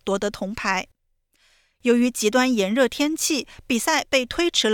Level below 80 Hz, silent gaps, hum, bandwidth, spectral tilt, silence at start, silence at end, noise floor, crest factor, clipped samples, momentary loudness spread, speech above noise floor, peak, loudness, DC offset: -52 dBFS; none; none; 18.5 kHz; -2.5 dB/octave; 0.05 s; 0 s; -67 dBFS; 16 dB; under 0.1%; 7 LU; 46 dB; -6 dBFS; -22 LUFS; under 0.1%